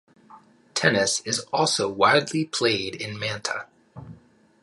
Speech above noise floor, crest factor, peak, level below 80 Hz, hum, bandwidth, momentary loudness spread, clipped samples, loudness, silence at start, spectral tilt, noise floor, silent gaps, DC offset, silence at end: 30 dB; 22 dB; -4 dBFS; -62 dBFS; none; 11.5 kHz; 13 LU; under 0.1%; -23 LUFS; 0.3 s; -3 dB/octave; -54 dBFS; none; under 0.1%; 0.45 s